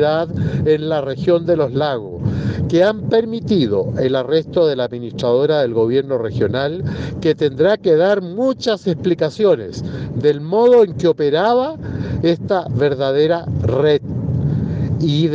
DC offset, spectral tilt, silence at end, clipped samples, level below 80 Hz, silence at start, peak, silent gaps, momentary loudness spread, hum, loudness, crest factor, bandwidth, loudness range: under 0.1%; -7.5 dB/octave; 0 s; under 0.1%; -42 dBFS; 0 s; -4 dBFS; none; 7 LU; none; -17 LUFS; 12 dB; 7.6 kHz; 2 LU